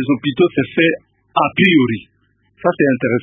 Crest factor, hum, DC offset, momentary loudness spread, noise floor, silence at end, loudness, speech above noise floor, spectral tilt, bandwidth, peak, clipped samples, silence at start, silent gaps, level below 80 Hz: 16 dB; none; under 0.1%; 9 LU; -53 dBFS; 0 s; -15 LUFS; 38 dB; -9 dB/octave; 3.8 kHz; 0 dBFS; under 0.1%; 0 s; none; -54 dBFS